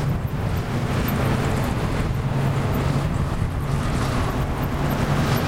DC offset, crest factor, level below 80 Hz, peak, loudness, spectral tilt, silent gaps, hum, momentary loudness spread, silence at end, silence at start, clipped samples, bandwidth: 0.4%; 12 dB; -30 dBFS; -8 dBFS; -23 LUFS; -6.5 dB/octave; none; none; 3 LU; 0 s; 0 s; under 0.1%; 16 kHz